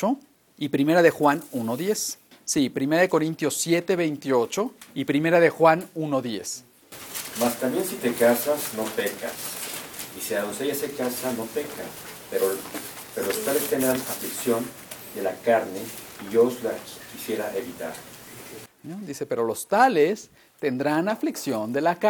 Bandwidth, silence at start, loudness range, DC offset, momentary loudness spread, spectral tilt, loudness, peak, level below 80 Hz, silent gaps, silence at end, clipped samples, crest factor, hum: 19.5 kHz; 0 s; 6 LU; under 0.1%; 16 LU; -4 dB/octave; -25 LUFS; -4 dBFS; -66 dBFS; none; 0 s; under 0.1%; 22 dB; none